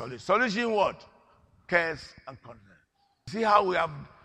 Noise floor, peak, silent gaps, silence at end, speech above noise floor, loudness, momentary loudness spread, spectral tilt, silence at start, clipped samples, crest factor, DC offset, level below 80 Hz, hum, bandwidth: -69 dBFS; -6 dBFS; none; 0.15 s; 41 dB; -26 LUFS; 22 LU; -5 dB/octave; 0 s; under 0.1%; 22 dB; under 0.1%; -62 dBFS; none; 10.5 kHz